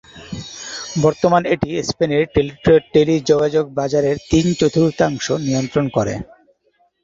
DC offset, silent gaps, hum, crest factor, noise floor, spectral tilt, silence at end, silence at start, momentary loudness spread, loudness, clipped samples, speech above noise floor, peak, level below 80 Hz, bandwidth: under 0.1%; none; none; 16 dB; -61 dBFS; -6 dB/octave; 0.8 s; 0.15 s; 13 LU; -17 LUFS; under 0.1%; 45 dB; -2 dBFS; -42 dBFS; 7.8 kHz